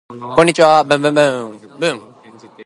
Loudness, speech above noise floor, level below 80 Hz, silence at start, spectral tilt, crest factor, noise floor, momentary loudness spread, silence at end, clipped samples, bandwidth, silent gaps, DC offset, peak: -13 LUFS; 28 dB; -56 dBFS; 0.1 s; -4.5 dB/octave; 16 dB; -42 dBFS; 15 LU; 0 s; under 0.1%; 11.5 kHz; none; under 0.1%; 0 dBFS